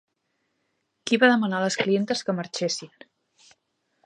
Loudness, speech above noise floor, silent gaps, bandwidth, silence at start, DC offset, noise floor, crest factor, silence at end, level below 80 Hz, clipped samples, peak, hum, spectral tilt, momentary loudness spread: -23 LUFS; 52 dB; none; 11 kHz; 1.05 s; under 0.1%; -75 dBFS; 22 dB; 1.2 s; -76 dBFS; under 0.1%; -6 dBFS; none; -4 dB/octave; 10 LU